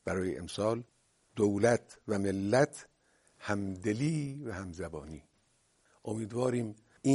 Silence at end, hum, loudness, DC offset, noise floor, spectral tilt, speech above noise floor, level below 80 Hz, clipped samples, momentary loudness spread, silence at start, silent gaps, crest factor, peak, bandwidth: 0 s; none; -33 LUFS; under 0.1%; -72 dBFS; -6 dB/octave; 39 dB; -62 dBFS; under 0.1%; 17 LU; 0.05 s; none; 20 dB; -12 dBFS; 11.5 kHz